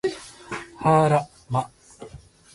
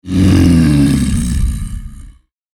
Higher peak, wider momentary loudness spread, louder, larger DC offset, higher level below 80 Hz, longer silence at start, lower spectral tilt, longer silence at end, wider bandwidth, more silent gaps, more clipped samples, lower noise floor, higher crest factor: second, -8 dBFS vs 0 dBFS; first, 25 LU vs 16 LU; second, -22 LUFS vs -12 LUFS; neither; second, -54 dBFS vs -20 dBFS; about the same, 0.05 s vs 0.05 s; about the same, -6.5 dB/octave vs -6.5 dB/octave; about the same, 0.4 s vs 0.45 s; second, 11.5 kHz vs 17 kHz; neither; neither; first, -46 dBFS vs -39 dBFS; first, 18 dB vs 12 dB